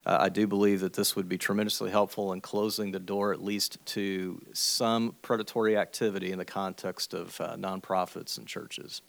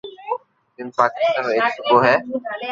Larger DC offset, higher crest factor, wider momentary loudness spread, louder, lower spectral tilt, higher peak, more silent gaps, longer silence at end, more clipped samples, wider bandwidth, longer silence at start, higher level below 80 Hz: neither; about the same, 20 dB vs 18 dB; second, 10 LU vs 14 LU; second, -30 LUFS vs -19 LUFS; second, -4 dB/octave vs -5.5 dB/octave; second, -10 dBFS vs -2 dBFS; neither; about the same, 0.1 s vs 0 s; neither; first, over 20 kHz vs 7.6 kHz; about the same, 0.05 s vs 0.05 s; second, -78 dBFS vs -64 dBFS